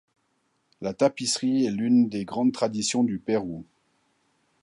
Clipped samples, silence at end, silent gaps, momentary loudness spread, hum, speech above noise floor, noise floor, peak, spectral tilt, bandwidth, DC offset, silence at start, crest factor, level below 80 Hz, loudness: under 0.1%; 1 s; none; 13 LU; none; 47 dB; -72 dBFS; -8 dBFS; -4.5 dB/octave; 11 kHz; under 0.1%; 0.8 s; 18 dB; -64 dBFS; -25 LUFS